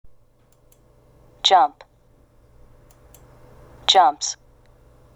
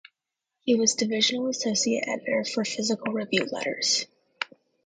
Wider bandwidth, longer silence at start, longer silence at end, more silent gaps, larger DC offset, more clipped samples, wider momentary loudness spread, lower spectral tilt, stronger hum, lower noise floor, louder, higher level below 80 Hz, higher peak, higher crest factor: first, 13.5 kHz vs 9.6 kHz; first, 1.45 s vs 0.65 s; first, 0.85 s vs 0.4 s; neither; neither; neither; about the same, 12 LU vs 13 LU; second, -0.5 dB/octave vs -2 dB/octave; neither; second, -56 dBFS vs -86 dBFS; first, -18 LUFS vs -26 LUFS; first, -54 dBFS vs -74 dBFS; first, 0 dBFS vs -8 dBFS; about the same, 24 dB vs 20 dB